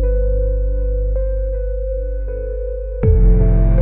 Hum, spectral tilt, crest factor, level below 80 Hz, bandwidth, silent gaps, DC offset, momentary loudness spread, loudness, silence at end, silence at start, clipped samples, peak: none; -12.5 dB/octave; 12 dB; -16 dBFS; 2.4 kHz; none; 0.2%; 11 LU; -19 LUFS; 0 s; 0 s; under 0.1%; -2 dBFS